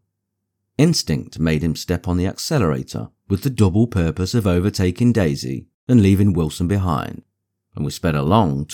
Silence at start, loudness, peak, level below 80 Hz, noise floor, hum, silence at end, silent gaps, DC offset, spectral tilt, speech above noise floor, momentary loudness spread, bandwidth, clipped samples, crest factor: 0.8 s; -19 LUFS; -2 dBFS; -38 dBFS; -77 dBFS; none; 0 s; 5.74-5.87 s; under 0.1%; -6.5 dB/octave; 59 dB; 12 LU; 18 kHz; under 0.1%; 18 dB